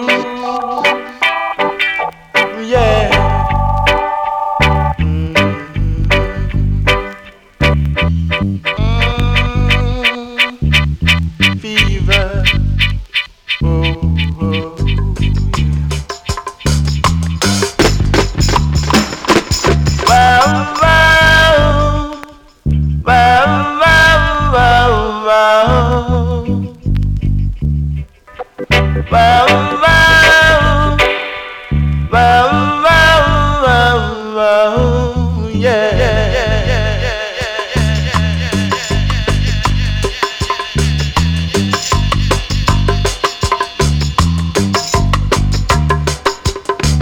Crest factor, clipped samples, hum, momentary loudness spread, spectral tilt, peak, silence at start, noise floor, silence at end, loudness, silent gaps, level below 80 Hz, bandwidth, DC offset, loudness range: 10 dB; under 0.1%; none; 9 LU; -5 dB/octave; -2 dBFS; 0 s; -35 dBFS; 0 s; -12 LUFS; none; -20 dBFS; 19 kHz; under 0.1%; 6 LU